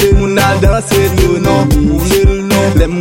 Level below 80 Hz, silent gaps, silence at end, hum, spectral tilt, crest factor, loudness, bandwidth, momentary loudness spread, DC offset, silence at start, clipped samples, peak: -16 dBFS; none; 0 s; none; -5.5 dB/octave; 10 dB; -10 LUFS; 17 kHz; 2 LU; under 0.1%; 0 s; under 0.1%; 0 dBFS